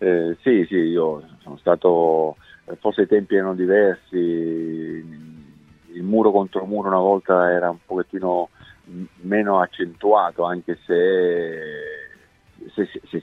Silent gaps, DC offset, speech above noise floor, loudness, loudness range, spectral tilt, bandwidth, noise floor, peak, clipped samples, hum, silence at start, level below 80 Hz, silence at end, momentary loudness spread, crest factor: none; under 0.1%; 32 dB; -20 LUFS; 2 LU; -8.5 dB/octave; 4.2 kHz; -51 dBFS; -2 dBFS; under 0.1%; none; 0 s; -62 dBFS; 0 s; 16 LU; 18 dB